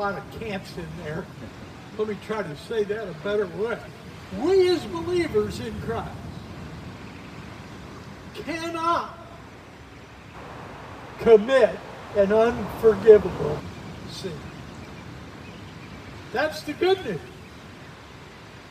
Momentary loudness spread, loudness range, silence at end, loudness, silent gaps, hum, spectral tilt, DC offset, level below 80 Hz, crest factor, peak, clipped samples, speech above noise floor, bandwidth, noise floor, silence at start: 23 LU; 12 LU; 0 s; -24 LUFS; none; none; -6 dB/octave; under 0.1%; -50 dBFS; 24 dB; -2 dBFS; under 0.1%; 21 dB; 14.5 kHz; -44 dBFS; 0 s